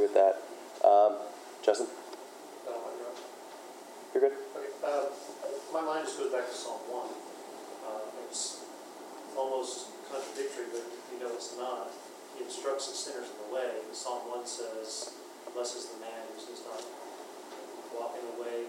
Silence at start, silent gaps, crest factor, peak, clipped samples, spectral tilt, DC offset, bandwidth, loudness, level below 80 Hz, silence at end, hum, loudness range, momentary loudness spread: 0 s; none; 24 dB; -10 dBFS; under 0.1%; -1 dB/octave; under 0.1%; 16 kHz; -35 LUFS; under -90 dBFS; 0 s; none; 9 LU; 16 LU